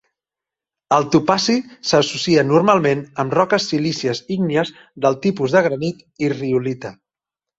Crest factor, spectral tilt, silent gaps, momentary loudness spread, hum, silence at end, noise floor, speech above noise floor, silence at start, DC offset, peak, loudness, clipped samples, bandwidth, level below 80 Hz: 18 dB; -5 dB/octave; none; 9 LU; none; 0.65 s; -88 dBFS; 70 dB; 0.9 s; under 0.1%; -2 dBFS; -18 LUFS; under 0.1%; 8 kHz; -56 dBFS